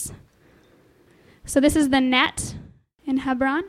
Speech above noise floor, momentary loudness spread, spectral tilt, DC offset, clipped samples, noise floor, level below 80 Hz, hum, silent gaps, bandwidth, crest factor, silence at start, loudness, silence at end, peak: 36 dB; 19 LU; -3.5 dB/octave; under 0.1%; under 0.1%; -56 dBFS; -46 dBFS; none; none; 16 kHz; 18 dB; 0 s; -21 LUFS; 0 s; -4 dBFS